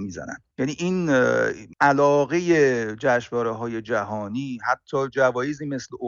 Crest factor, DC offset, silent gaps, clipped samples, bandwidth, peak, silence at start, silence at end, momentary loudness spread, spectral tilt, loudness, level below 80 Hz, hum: 18 dB; under 0.1%; none; under 0.1%; 7.6 kHz; -6 dBFS; 0 s; 0 s; 11 LU; -6 dB/octave; -22 LUFS; -60 dBFS; none